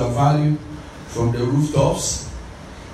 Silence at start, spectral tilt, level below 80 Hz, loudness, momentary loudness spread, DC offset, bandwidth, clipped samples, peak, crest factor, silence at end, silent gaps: 0 s; -6 dB/octave; -38 dBFS; -20 LUFS; 19 LU; under 0.1%; 13 kHz; under 0.1%; -4 dBFS; 16 dB; 0 s; none